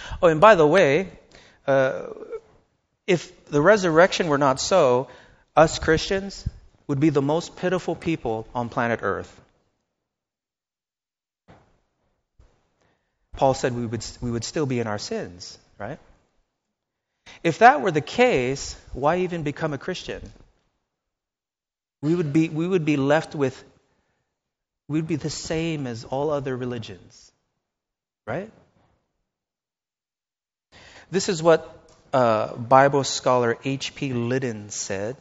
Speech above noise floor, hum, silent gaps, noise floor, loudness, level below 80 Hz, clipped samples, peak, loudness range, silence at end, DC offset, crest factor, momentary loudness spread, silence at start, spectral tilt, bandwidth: over 68 dB; none; none; under -90 dBFS; -22 LUFS; -50 dBFS; under 0.1%; 0 dBFS; 11 LU; 0.05 s; under 0.1%; 24 dB; 18 LU; 0 s; -4.5 dB/octave; 8 kHz